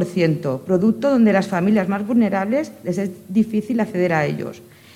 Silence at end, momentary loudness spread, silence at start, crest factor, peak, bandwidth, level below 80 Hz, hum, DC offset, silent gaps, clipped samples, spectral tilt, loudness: 0.35 s; 8 LU; 0 s; 16 dB; -4 dBFS; 14 kHz; -62 dBFS; none; under 0.1%; none; under 0.1%; -7.5 dB/octave; -19 LUFS